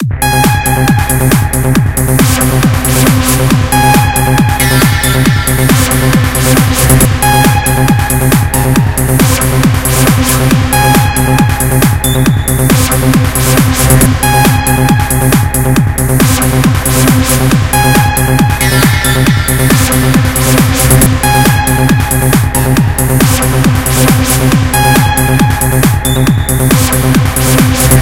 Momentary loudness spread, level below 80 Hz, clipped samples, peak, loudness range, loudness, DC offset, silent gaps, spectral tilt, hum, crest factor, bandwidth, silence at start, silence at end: 2 LU; -18 dBFS; 1%; 0 dBFS; 1 LU; -8 LUFS; under 0.1%; none; -4.5 dB/octave; none; 8 dB; over 20 kHz; 0 s; 0 s